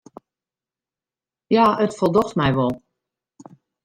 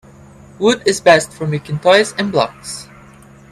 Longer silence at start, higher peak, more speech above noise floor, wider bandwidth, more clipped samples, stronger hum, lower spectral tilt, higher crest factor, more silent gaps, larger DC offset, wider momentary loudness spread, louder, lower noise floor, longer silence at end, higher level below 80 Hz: first, 1.5 s vs 0.6 s; second, -4 dBFS vs 0 dBFS; first, over 72 dB vs 27 dB; first, 15.5 kHz vs 14 kHz; neither; neither; first, -7 dB/octave vs -4 dB/octave; about the same, 18 dB vs 16 dB; neither; neither; second, 7 LU vs 14 LU; second, -19 LUFS vs -14 LUFS; first, under -90 dBFS vs -42 dBFS; first, 1.1 s vs 0.7 s; about the same, -52 dBFS vs -52 dBFS